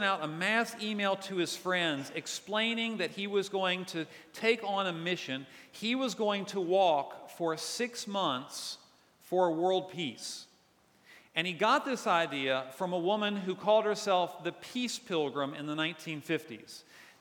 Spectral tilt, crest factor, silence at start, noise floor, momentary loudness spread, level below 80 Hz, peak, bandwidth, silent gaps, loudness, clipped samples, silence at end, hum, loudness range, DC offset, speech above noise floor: -3.5 dB/octave; 20 dB; 0 s; -66 dBFS; 12 LU; -86 dBFS; -12 dBFS; 19 kHz; none; -32 LUFS; under 0.1%; 0.1 s; none; 3 LU; under 0.1%; 34 dB